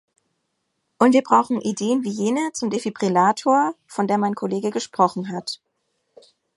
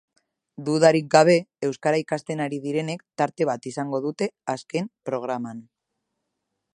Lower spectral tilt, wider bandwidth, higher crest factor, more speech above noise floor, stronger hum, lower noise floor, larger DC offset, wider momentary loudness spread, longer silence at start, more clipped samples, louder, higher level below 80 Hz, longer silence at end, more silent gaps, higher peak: about the same, -5 dB/octave vs -5.5 dB/octave; about the same, 11.5 kHz vs 11.5 kHz; about the same, 20 dB vs 24 dB; about the same, 54 dB vs 57 dB; neither; second, -74 dBFS vs -80 dBFS; neither; second, 10 LU vs 14 LU; first, 1 s vs 0.6 s; neither; first, -21 LUFS vs -24 LUFS; about the same, -72 dBFS vs -74 dBFS; second, 1 s vs 1.15 s; neither; about the same, -2 dBFS vs 0 dBFS